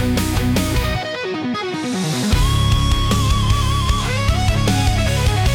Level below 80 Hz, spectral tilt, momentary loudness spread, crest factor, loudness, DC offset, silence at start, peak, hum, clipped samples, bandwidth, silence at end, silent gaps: -22 dBFS; -5 dB/octave; 6 LU; 12 dB; -18 LUFS; under 0.1%; 0 s; -6 dBFS; none; under 0.1%; 18.5 kHz; 0 s; none